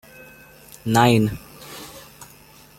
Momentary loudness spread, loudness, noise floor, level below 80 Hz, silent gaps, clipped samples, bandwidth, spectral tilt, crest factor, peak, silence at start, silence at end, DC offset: 27 LU; -19 LUFS; -48 dBFS; -52 dBFS; none; under 0.1%; 16.5 kHz; -5.5 dB/octave; 22 dB; -2 dBFS; 0.85 s; 0.55 s; under 0.1%